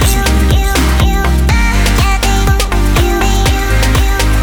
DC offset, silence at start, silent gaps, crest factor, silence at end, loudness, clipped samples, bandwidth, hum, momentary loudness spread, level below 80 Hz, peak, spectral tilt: under 0.1%; 0 s; none; 10 dB; 0 s; -12 LUFS; under 0.1%; 19.5 kHz; none; 1 LU; -12 dBFS; 0 dBFS; -4.5 dB/octave